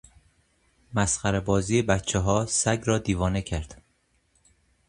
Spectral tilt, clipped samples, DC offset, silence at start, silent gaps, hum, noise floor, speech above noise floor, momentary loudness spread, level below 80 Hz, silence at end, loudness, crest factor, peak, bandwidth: -4.5 dB/octave; under 0.1%; under 0.1%; 0.9 s; none; none; -68 dBFS; 44 dB; 8 LU; -42 dBFS; 1.15 s; -25 LUFS; 20 dB; -8 dBFS; 11.5 kHz